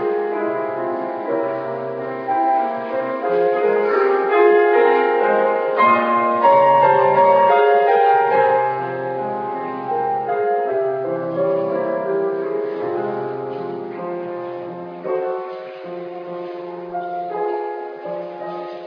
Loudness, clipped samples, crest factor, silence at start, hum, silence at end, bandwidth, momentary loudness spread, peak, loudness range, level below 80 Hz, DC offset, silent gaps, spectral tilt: -18 LUFS; under 0.1%; 16 dB; 0 s; none; 0 s; 5.4 kHz; 16 LU; -2 dBFS; 13 LU; -74 dBFS; under 0.1%; none; -8.5 dB/octave